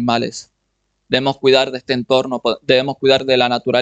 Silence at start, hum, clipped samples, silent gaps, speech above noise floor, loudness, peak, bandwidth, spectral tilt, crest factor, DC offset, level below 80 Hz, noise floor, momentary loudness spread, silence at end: 0 s; none; under 0.1%; none; 53 dB; -16 LUFS; 0 dBFS; 8.6 kHz; -4.5 dB/octave; 16 dB; under 0.1%; -54 dBFS; -69 dBFS; 7 LU; 0 s